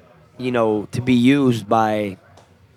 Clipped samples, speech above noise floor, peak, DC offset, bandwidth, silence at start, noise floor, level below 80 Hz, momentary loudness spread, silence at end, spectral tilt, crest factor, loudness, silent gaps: under 0.1%; 32 dB; -4 dBFS; under 0.1%; 14 kHz; 0.4 s; -50 dBFS; -60 dBFS; 10 LU; 0.6 s; -7 dB/octave; 16 dB; -19 LUFS; none